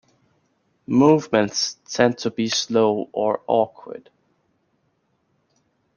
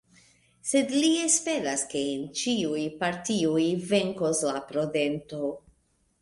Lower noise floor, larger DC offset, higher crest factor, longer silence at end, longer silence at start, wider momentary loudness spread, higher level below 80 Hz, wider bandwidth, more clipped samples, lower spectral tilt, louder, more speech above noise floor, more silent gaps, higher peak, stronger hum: about the same, -68 dBFS vs -69 dBFS; neither; about the same, 22 dB vs 20 dB; first, 1.95 s vs 0.65 s; first, 0.9 s vs 0.65 s; about the same, 10 LU vs 9 LU; about the same, -66 dBFS vs -66 dBFS; second, 10 kHz vs 11.5 kHz; neither; about the same, -4.5 dB/octave vs -3.5 dB/octave; first, -20 LUFS vs -27 LUFS; first, 48 dB vs 42 dB; neither; first, 0 dBFS vs -8 dBFS; neither